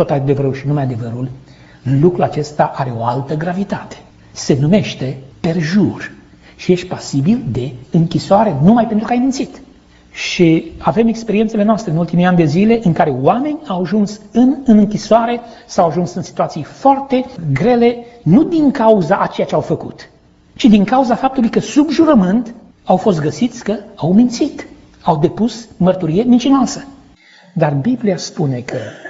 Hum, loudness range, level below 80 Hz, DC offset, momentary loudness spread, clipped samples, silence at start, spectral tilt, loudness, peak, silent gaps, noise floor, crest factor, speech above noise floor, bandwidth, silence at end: none; 4 LU; -44 dBFS; under 0.1%; 11 LU; under 0.1%; 0 s; -7 dB/octave; -14 LUFS; 0 dBFS; none; -45 dBFS; 14 dB; 31 dB; 8 kHz; 0 s